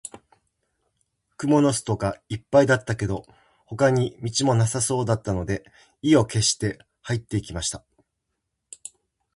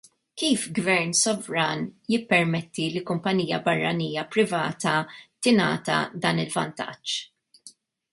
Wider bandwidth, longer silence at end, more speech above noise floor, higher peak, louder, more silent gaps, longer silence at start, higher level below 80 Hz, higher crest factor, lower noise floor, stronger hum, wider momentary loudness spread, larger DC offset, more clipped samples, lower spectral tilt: about the same, 11.5 kHz vs 11.5 kHz; first, 1.55 s vs 0.4 s; first, 57 dB vs 28 dB; about the same, -4 dBFS vs -6 dBFS; about the same, -23 LUFS vs -25 LUFS; neither; second, 0.05 s vs 0.35 s; first, -48 dBFS vs -66 dBFS; about the same, 20 dB vs 20 dB; first, -79 dBFS vs -53 dBFS; neither; first, 20 LU vs 9 LU; neither; neither; about the same, -5 dB/octave vs -4 dB/octave